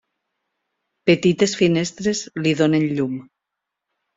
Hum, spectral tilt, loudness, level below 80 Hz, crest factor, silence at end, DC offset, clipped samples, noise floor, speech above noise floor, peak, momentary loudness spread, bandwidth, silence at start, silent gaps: none; -5.5 dB/octave; -19 LUFS; -60 dBFS; 18 dB; 0.95 s; under 0.1%; under 0.1%; -82 dBFS; 64 dB; -2 dBFS; 7 LU; 8 kHz; 1.05 s; none